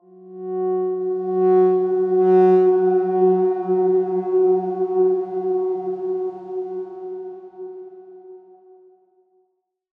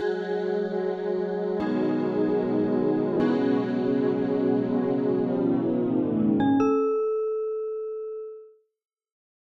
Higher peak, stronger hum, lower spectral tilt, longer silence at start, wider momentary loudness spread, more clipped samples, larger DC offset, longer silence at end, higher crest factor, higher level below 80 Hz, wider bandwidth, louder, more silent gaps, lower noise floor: first, -6 dBFS vs -12 dBFS; neither; first, -11 dB/octave vs -9 dB/octave; first, 0.2 s vs 0 s; first, 19 LU vs 7 LU; neither; neither; first, 1.6 s vs 1.1 s; about the same, 14 dB vs 14 dB; second, -80 dBFS vs -64 dBFS; second, 2.9 kHz vs 6.4 kHz; first, -19 LUFS vs -25 LUFS; neither; first, -70 dBFS vs -50 dBFS